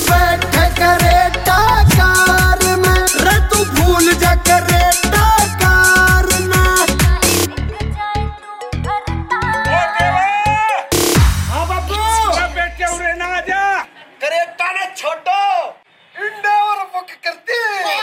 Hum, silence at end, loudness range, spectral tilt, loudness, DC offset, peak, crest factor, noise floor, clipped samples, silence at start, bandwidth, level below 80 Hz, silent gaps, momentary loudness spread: none; 0 s; 7 LU; -3.5 dB/octave; -13 LUFS; under 0.1%; 0 dBFS; 14 dB; -38 dBFS; under 0.1%; 0 s; 17 kHz; -22 dBFS; none; 11 LU